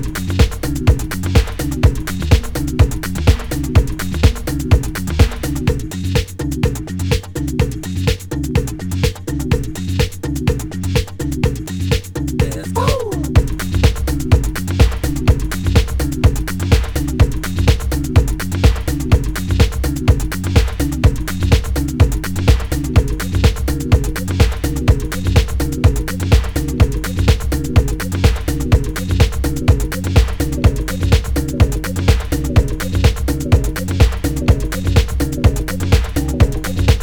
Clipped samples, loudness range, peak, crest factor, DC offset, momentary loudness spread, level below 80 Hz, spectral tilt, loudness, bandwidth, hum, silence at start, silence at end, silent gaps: under 0.1%; 3 LU; 0 dBFS; 16 dB; under 0.1%; 4 LU; -18 dBFS; -6 dB/octave; -17 LUFS; over 20 kHz; none; 0 s; 0 s; none